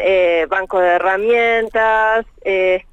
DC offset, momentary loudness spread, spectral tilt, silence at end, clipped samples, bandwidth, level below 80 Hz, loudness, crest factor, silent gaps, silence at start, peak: under 0.1%; 4 LU; -4.5 dB/octave; 0.1 s; under 0.1%; 8 kHz; -44 dBFS; -15 LUFS; 10 dB; none; 0 s; -6 dBFS